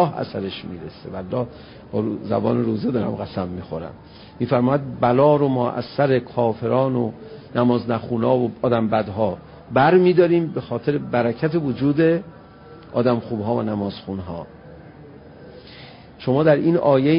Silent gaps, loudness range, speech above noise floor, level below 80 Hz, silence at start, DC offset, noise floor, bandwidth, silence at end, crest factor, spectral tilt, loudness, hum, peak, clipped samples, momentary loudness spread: none; 7 LU; 23 dB; -50 dBFS; 0 s; under 0.1%; -43 dBFS; 5.4 kHz; 0 s; 18 dB; -12.5 dB/octave; -21 LUFS; none; -4 dBFS; under 0.1%; 17 LU